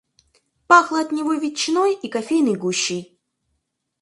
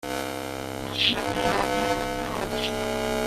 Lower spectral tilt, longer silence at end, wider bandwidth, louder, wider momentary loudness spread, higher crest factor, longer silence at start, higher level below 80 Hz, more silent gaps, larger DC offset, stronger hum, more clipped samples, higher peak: about the same, -3.5 dB/octave vs -3.5 dB/octave; first, 1 s vs 0 s; second, 11.5 kHz vs 16 kHz; first, -19 LUFS vs -26 LUFS; about the same, 9 LU vs 9 LU; about the same, 22 dB vs 22 dB; first, 0.7 s vs 0 s; second, -70 dBFS vs -44 dBFS; neither; neither; neither; neither; first, 0 dBFS vs -4 dBFS